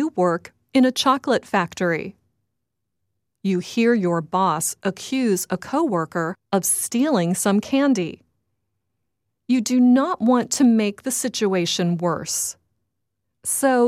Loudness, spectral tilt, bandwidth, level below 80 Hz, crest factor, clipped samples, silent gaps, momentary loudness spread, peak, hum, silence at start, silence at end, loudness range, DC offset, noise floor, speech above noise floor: -21 LUFS; -4.5 dB/octave; 16 kHz; -66 dBFS; 16 dB; under 0.1%; none; 8 LU; -4 dBFS; none; 0 s; 0 s; 4 LU; under 0.1%; -80 dBFS; 60 dB